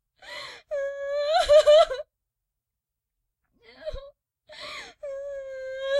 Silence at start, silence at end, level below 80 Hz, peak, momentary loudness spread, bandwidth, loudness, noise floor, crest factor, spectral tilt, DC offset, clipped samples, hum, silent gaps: 0.25 s; 0 s; -52 dBFS; -8 dBFS; 22 LU; 12 kHz; -22 LUFS; -86 dBFS; 18 dB; -1 dB/octave; under 0.1%; under 0.1%; none; none